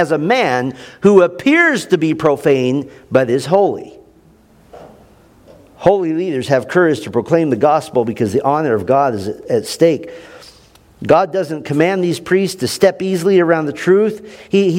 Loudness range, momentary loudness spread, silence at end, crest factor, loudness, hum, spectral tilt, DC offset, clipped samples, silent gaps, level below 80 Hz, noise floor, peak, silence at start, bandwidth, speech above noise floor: 5 LU; 8 LU; 0 s; 16 dB; -15 LUFS; none; -6 dB/octave; under 0.1%; 0.1%; none; -54 dBFS; -48 dBFS; 0 dBFS; 0 s; 16.5 kHz; 34 dB